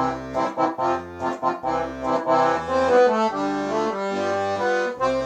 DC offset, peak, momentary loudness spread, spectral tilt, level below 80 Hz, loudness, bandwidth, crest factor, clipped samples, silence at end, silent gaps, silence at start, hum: under 0.1%; -8 dBFS; 8 LU; -5.5 dB/octave; -52 dBFS; -22 LUFS; 9 kHz; 14 dB; under 0.1%; 0 s; none; 0 s; none